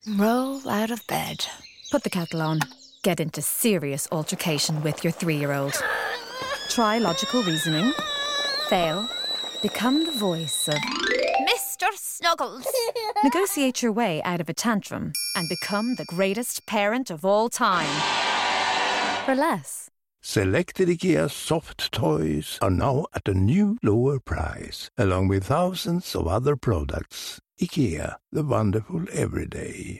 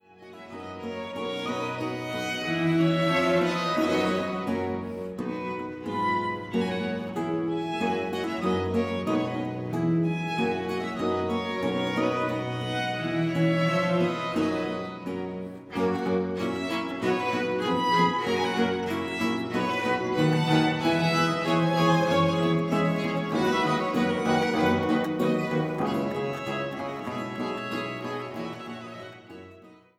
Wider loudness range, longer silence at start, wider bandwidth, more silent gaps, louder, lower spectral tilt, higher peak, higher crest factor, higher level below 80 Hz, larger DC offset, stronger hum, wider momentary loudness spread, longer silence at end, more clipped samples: about the same, 3 LU vs 5 LU; second, 0.05 s vs 0.2 s; first, 17 kHz vs 15 kHz; neither; first, -24 LUFS vs -27 LUFS; second, -4.5 dB/octave vs -6 dB/octave; about the same, -8 dBFS vs -8 dBFS; about the same, 18 dB vs 18 dB; first, -46 dBFS vs -62 dBFS; neither; neither; second, 8 LU vs 11 LU; second, 0 s vs 0.25 s; neither